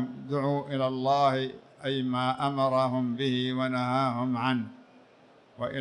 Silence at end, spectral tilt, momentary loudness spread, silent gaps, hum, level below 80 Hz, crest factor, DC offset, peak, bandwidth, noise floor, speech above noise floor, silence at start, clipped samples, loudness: 0 s; -7 dB/octave; 8 LU; none; none; -70 dBFS; 16 dB; under 0.1%; -12 dBFS; 10 kHz; -58 dBFS; 30 dB; 0 s; under 0.1%; -28 LUFS